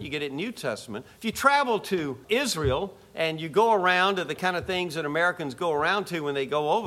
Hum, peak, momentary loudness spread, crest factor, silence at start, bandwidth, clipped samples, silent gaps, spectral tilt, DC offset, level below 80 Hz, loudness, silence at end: none; -4 dBFS; 11 LU; 22 dB; 0 s; 16 kHz; under 0.1%; none; -4 dB/octave; under 0.1%; -52 dBFS; -26 LUFS; 0 s